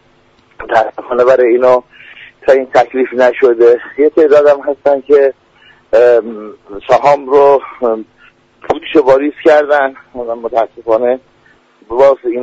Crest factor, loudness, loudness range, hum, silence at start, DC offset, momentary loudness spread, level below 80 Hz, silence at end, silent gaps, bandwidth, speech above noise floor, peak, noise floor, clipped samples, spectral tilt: 12 dB; -11 LUFS; 3 LU; none; 0.6 s; under 0.1%; 12 LU; -50 dBFS; 0 s; none; 7.8 kHz; 40 dB; 0 dBFS; -49 dBFS; under 0.1%; -5.5 dB/octave